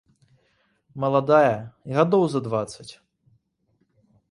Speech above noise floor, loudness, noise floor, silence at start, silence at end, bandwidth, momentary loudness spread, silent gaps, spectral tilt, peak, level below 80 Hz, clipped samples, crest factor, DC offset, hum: 48 dB; -22 LUFS; -70 dBFS; 0.95 s; 1.4 s; 11.5 kHz; 21 LU; none; -7 dB/octave; -4 dBFS; -64 dBFS; under 0.1%; 20 dB; under 0.1%; none